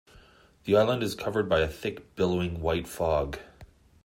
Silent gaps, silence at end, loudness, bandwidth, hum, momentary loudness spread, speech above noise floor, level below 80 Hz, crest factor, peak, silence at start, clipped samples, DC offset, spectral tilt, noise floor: none; 0.4 s; -28 LUFS; 16 kHz; none; 12 LU; 30 dB; -48 dBFS; 18 dB; -10 dBFS; 0.65 s; under 0.1%; under 0.1%; -6 dB/octave; -57 dBFS